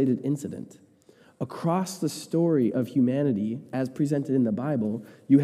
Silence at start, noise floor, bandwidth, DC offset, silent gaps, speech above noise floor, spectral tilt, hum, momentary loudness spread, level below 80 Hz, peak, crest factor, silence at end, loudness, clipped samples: 0 s; -57 dBFS; 14 kHz; under 0.1%; none; 32 dB; -7.5 dB/octave; none; 13 LU; -74 dBFS; -8 dBFS; 18 dB; 0 s; -27 LUFS; under 0.1%